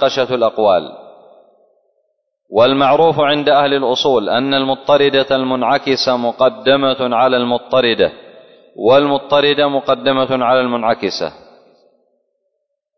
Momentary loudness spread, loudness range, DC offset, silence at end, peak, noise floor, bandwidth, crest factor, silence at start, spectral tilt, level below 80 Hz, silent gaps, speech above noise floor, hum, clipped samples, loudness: 5 LU; 3 LU; under 0.1%; 1.65 s; -2 dBFS; -72 dBFS; 6.4 kHz; 14 dB; 0 s; -5 dB/octave; -56 dBFS; none; 58 dB; none; under 0.1%; -14 LUFS